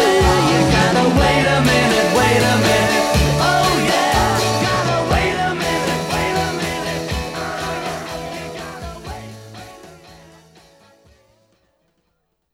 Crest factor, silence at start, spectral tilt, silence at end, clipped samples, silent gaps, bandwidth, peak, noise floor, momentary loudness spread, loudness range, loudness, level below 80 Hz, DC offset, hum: 16 dB; 0 s; -4.5 dB/octave; 2.4 s; under 0.1%; none; 16.5 kHz; -2 dBFS; -69 dBFS; 16 LU; 18 LU; -16 LUFS; -32 dBFS; under 0.1%; none